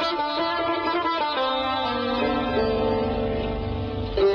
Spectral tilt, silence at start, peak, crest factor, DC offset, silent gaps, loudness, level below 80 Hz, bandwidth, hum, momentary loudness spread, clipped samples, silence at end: -7 dB/octave; 0 s; -10 dBFS; 14 dB; under 0.1%; none; -24 LUFS; -38 dBFS; 7 kHz; none; 5 LU; under 0.1%; 0 s